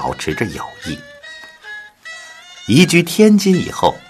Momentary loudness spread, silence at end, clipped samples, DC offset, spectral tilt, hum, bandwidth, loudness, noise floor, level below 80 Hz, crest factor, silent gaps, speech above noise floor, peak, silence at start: 23 LU; 0.1 s; under 0.1%; under 0.1%; -5 dB/octave; none; 14 kHz; -13 LUFS; -37 dBFS; -46 dBFS; 16 dB; none; 23 dB; 0 dBFS; 0 s